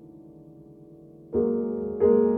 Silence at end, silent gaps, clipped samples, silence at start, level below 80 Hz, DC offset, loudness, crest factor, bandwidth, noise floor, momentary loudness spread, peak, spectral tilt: 0 s; none; under 0.1%; 0.05 s; -56 dBFS; under 0.1%; -25 LUFS; 16 dB; 2.5 kHz; -48 dBFS; 9 LU; -10 dBFS; -12 dB/octave